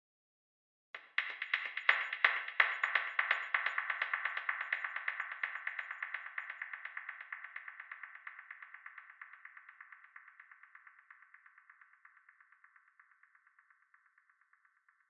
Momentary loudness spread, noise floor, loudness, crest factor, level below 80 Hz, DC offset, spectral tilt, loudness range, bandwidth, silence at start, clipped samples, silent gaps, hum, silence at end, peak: 24 LU; -73 dBFS; -36 LUFS; 30 dB; under -90 dBFS; under 0.1%; 8.5 dB/octave; 22 LU; 7 kHz; 0.95 s; under 0.1%; none; none; 3.75 s; -10 dBFS